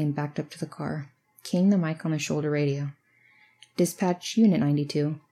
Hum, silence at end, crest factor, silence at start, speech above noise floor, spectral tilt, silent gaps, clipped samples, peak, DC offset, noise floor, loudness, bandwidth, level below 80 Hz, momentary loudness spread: none; 0.15 s; 16 dB; 0 s; 35 dB; -6.5 dB/octave; none; under 0.1%; -10 dBFS; under 0.1%; -61 dBFS; -27 LUFS; 14.5 kHz; -76 dBFS; 15 LU